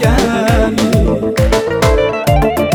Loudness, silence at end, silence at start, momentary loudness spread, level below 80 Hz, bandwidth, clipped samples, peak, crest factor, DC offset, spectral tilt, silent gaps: -13 LUFS; 0 s; 0 s; 1 LU; -18 dBFS; 19.5 kHz; under 0.1%; 0 dBFS; 12 dB; under 0.1%; -6 dB/octave; none